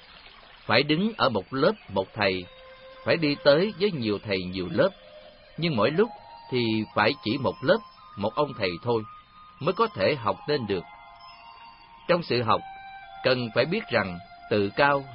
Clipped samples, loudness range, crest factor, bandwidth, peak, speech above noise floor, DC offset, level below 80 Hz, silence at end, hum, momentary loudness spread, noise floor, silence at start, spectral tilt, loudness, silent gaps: under 0.1%; 3 LU; 22 dB; 5.6 kHz; -4 dBFS; 25 dB; under 0.1%; -60 dBFS; 0 s; none; 19 LU; -50 dBFS; 0.15 s; -10 dB/octave; -26 LUFS; none